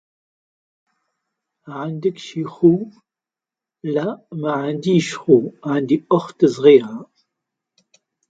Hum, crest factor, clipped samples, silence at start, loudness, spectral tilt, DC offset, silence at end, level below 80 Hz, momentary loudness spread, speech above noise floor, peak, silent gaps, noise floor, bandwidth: none; 20 dB; under 0.1%; 1.65 s; -18 LUFS; -7 dB/octave; under 0.1%; 1.25 s; -66 dBFS; 17 LU; 71 dB; 0 dBFS; none; -89 dBFS; 9 kHz